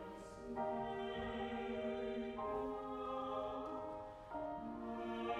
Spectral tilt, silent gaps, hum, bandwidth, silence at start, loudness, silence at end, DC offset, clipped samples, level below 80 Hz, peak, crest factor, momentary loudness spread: -6.5 dB/octave; none; none; 11.5 kHz; 0 s; -45 LUFS; 0 s; under 0.1%; under 0.1%; -64 dBFS; -28 dBFS; 16 dB; 6 LU